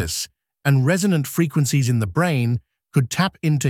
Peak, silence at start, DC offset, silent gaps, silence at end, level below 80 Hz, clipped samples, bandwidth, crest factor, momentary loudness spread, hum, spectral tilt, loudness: -6 dBFS; 0 s; under 0.1%; none; 0 s; -48 dBFS; under 0.1%; 16.5 kHz; 14 dB; 8 LU; none; -5.5 dB/octave; -20 LUFS